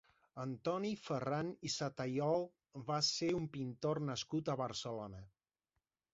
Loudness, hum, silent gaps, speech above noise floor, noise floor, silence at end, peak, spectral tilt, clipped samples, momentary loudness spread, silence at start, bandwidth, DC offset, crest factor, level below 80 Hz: -40 LUFS; none; none; 49 dB; -89 dBFS; 0.85 s; -24 dBFS; -4.5 dB/octave; under 0.1%; 12 LU; 0.35 s; 7.6 kHz; under 0.1%; 18 dB; -72 dBFS